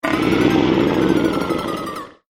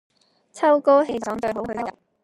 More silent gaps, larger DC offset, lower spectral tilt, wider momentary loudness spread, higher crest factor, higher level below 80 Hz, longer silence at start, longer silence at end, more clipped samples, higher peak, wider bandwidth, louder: neither; neither; about the same, -6 dB/octave vs -5.5 dB/octave; second, 10 LU vs 13 LU; about the same, 16 dB vs 18 dB; first, -40 dBFS vs -60 dBFS; second, 0.05 s vs 0.55 s; second, 0.2 s vs 0.35 s; neither; about the same, -2 dBFS vs -4 dBFS; first, 16 kHz vs 11 kHz; first, -18 LUFS vs -21 LUFS